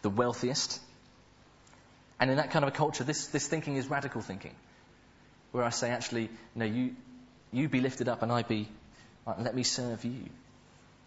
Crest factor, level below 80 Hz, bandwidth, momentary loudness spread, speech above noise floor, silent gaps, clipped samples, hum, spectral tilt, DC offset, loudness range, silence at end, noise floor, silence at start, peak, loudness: 24 dB; -66 dBFS; 8 kHz; 11 LU; 28 dB; none; under 0.1%; none; -4.5 dB/octave; under 0.1%; 3 LU; 0.65 s; -60 dBFS; 0 s; -8 dBFS; -32 LUFS